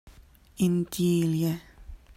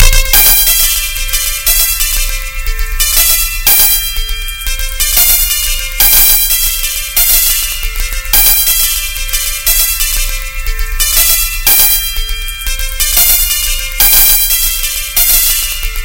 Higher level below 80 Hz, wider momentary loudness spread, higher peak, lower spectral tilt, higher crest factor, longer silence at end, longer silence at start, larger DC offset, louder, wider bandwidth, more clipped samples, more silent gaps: second, -52 dBFS vs -18 dBFS; second, 5 LU vs 13 LU; second, -14 dBFS vs 0 dBFS; first, -6.5 dB/octave vs 1 dB/octave; about the same, 14 dB vs 10 dB; first, 0.2 s vs 0 s; about the same, 0.05 s vs 0 s; second, under 0.1% vs 0.9%; second, -27 LUFS vs -8 LUFS; second, 16 kHz vs over 20 kHz; second, under 0.1% vs 1%; neither